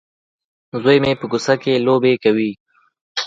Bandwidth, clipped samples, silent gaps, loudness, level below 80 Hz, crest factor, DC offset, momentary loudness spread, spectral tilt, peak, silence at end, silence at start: 7.8 kHz; under 0.1%; 2.60-2.66 s, 3.01-3.15 s; -17 LUFS; -56 dBFS; 18 dB; under 0.1%; 10 LU; -5.5 dB/octave; 0 dBFS; 0 s; 0.75 s